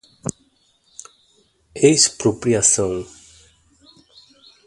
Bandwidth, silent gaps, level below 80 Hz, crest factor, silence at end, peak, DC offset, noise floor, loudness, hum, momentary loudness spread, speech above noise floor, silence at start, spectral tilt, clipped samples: 11.5 kHz; none; -52 dBFS; 22 dB; 1.6 s; 0 dBFS; under 0.1%; -61 dBFS; -16 LUFS; none; 27 LU; 44 dB; 0.25 s; -3 dB/octave; under 0.1%